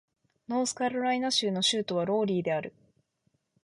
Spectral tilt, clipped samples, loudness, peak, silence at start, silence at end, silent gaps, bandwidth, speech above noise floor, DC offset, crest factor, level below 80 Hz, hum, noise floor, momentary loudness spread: -3.5 dB/octave; under 0.1%; -28 LUFS; -16 dBFS; 0.5 s; 1 s; none; 11.5 kHz; 46 dB; under 0.1%; 16 dB; -74 dBFS; none; -75 dBFS; 7 LU